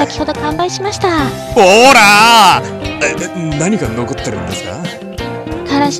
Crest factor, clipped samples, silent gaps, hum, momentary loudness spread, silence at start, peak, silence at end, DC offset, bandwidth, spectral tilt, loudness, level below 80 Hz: 12 dB; 0.6%; none; none; 18 LU; 0 s; 0 dBFS; 0 s; under 0.1%; over 20 kHz; -3.5 dB/octave; -10 LUFS; -34 dBFS